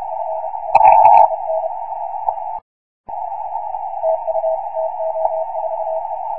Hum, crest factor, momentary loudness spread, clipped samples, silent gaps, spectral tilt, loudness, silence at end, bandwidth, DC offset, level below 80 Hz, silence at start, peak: none; 18 dB; 16 LU; under 0.1%; 2.62-3.04 s; -5.5 dB/octave; -17 LUFS; 0 s; 4.4 kHz; 1%; -54 dBFS; 0 s; 0 dBFS